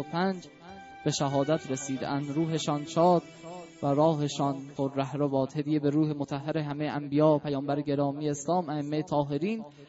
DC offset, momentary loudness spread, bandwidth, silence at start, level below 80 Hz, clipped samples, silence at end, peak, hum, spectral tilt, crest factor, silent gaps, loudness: under 0.1%; 9 LU; 8 kHz; 0 s; -68 dBFS; under 0.1%; 0.05 s; -12 dBFS; none; -6 dB/octave; 18 dB; none; -29 LUFS